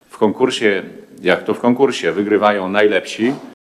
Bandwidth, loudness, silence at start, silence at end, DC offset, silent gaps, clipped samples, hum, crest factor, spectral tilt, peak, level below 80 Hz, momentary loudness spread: 12.5 kHz; -16 LUFS; 0.15 s; 0.1 s; under 0.1%; none; under 0.1%; none; 16 dB; -5 dB/octave; 0 dBFS; -66 dBFS; 6 LU